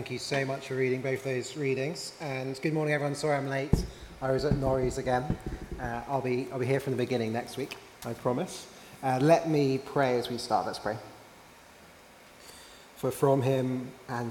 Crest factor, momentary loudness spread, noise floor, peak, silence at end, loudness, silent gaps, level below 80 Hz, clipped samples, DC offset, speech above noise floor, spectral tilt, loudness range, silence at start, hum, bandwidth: 22 dB; 14 LU; -54 dBFS; -8 dBFS; 0 s; -30 LUFS; none; -48 dBFS; under 0.1%; under 0.1%; 24 dB; -6 dB/octave; 4 LU; 0 s; none; 17.5 kHz